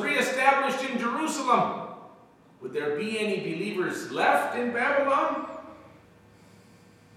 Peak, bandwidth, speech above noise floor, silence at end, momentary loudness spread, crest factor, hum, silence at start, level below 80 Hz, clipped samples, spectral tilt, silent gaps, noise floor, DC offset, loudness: -8 dBFS; 16 kHz; 28 dB; 1.3 s; 17 LU; 20 dB; none; 0 s; -74 dBFS; under 0.1%; -4 dB/octave; none; -55 dBFS; under 0.1%; -26 LUFS